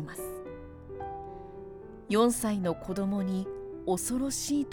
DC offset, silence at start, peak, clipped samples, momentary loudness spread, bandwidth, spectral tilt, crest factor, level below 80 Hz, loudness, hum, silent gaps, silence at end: under 0.1%; 0 s; -14 dBFS; under 0.1%; 19 LU; over 20 kHz; -5 dB/octave; 18 dB; -54 dBFS; -31 LUFS; none; none; 0 s